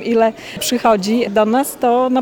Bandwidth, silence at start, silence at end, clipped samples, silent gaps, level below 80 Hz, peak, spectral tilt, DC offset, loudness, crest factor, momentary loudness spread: 19.5 kHz; 0 s; 0 s; under 0.1%; none; -52 dBFS; -2 dBFS; -4 dB/octave; under 0.1%; -16 LUFS; 14 dB; 4 LU